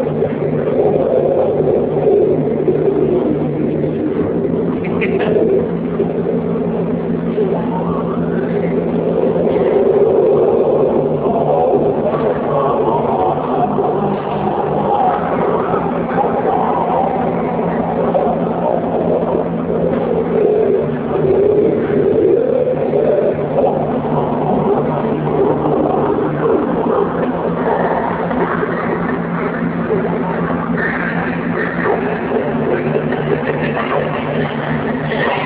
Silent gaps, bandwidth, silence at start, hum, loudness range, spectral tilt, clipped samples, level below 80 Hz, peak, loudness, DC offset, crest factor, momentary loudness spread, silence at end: none; 4 kHz; 0 s; none; 3 LU; -11.5 dB/octave; under 0.1%; -42 dBFS; 0 dBFS; -16 LUFS; under 0.1%; 14 dB; 5 LU; 0 s